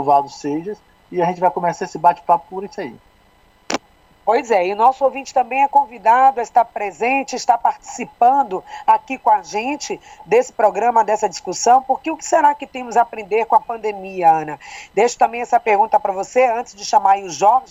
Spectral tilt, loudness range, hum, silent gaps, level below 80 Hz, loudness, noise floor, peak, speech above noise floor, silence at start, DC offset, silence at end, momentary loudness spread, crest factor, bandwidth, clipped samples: -3.5 dB/octave; 4 LU; none; none; -58 dBFS; -17 LUFS; -53 dBFS; -2 dBFS; 36 dB; 0 s; under 0.1%; 0.05 s; 11 LU; 16 dB; 8.4 kHz; under 0.1%